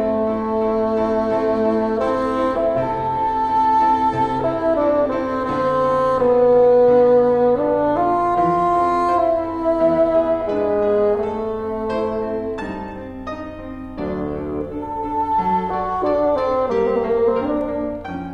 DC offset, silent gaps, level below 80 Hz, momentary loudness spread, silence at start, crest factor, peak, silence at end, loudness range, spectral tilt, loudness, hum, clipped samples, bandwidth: under 0.1%; none; -42 dBFS; 12 LU; 0 s; 14 dB; -6 dBFS; 0 s; 9 LU; -8 dB/octave; -18 LUFS; none; under 0.1%; 8.6 kHz